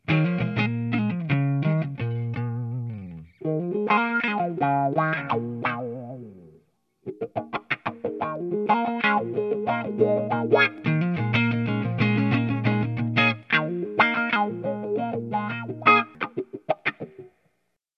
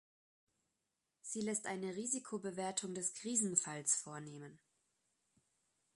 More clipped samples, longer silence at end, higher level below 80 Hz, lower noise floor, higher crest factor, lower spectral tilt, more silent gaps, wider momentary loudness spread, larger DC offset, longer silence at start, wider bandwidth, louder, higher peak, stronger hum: neither; second, 0.7 s vs 1.4 s; first, -60 dBFS vs -86 dBFS; second, -74 dBFS vs -88 dBFS; about the same, 22 dB vs 26 dB; first, -8.5 dB/octave vs -3 dB/octave; neither; second, 12 LU vs 16 LU; neither; second, 0.1 s vs 1.25 s; second, 6.4 kHz vs 12 kHz; first, -24 LUFS vs -39 LUFS; first, -4 dBFS vs -18 dBFS; neither